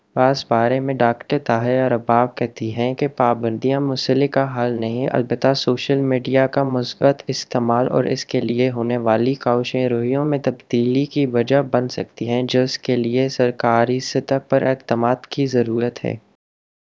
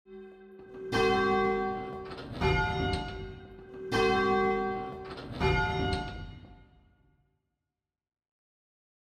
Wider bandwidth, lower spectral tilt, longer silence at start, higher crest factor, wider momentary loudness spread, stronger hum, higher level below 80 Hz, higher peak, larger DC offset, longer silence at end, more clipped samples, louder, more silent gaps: second, 7.6 kHz vs 12 kHz; about the same, -6.5 dB/octave vs -6 dB/octave; about the same, 0.15 s vs 0.1 s; about the same, 18 dB vs 18 dB; second, 5 LU vs 21 LU; neither; second, -62 dBFS vs -44 dBFS; first, 0 dBFS vs -14 dBFS; neither; second, 0.8 s vs 2.4 s; neither; first, -19 LUFS vs -30 LUFS; neither